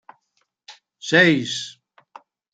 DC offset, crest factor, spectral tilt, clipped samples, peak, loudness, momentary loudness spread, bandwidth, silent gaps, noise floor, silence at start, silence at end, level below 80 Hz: under 0.1%; 22 dB; -4 dB/octave; under 0.1%; 0 dBFS; -18 LUFS; 20 LU; 9.2 kHz; none; -71 dBFS; 0.7 s; 0.85 s; -70 dBFS